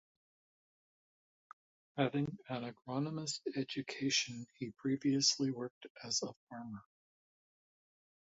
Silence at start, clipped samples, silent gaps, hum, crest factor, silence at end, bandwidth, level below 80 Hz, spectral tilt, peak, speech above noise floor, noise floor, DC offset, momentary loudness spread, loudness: 1.95 s; under 0.1%; 5.70-5.81 s, 5.90-5.95 s, 6.36-6.47 s; none; 22 dB; 1.55 s; 7.6 kHz; -78 dBFS; -4 dB/octave; -18 dBFS; over 52 dB; under -90 dBFS; under 0.1%; 17 LU; -37 LUFS